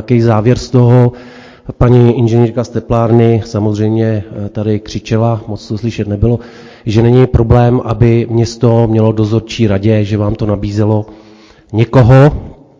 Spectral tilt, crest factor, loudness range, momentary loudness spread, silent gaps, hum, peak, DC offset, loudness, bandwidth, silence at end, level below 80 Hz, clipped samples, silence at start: -8.5 dB/octave; 10 dB; 4 LU; 11 LU; none; none; 0 dBFS; under 0.1%; -11 LUFS; 7.6 kHz; 0.25 s; -28 dBFS; 2%; 0 s